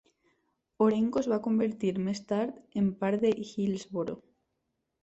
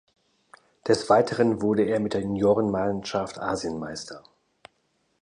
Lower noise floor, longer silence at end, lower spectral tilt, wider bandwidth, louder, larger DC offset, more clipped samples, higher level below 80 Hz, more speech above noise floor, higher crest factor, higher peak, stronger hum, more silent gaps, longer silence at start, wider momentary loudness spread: first, -81 dBFS vs -71 dBFS; second, 0.85 s vs 1.05 s; about the same, -7 dB/octave vs -6 dB/octave; second, 8 kHz vs 10.5 kHz; second, -30 LUFS vs -25 LUFS; neither; neither; second, -68 dBFS vs -56 dBFS; first, 52 dB vs 47 dB; about the same, 18 dB vs 20 dB; second, -12 dBFS vs -6 dBFS; neither; neither; about the same, 0.8 s vs 0.85 s; second, 8 LU vs 14 LU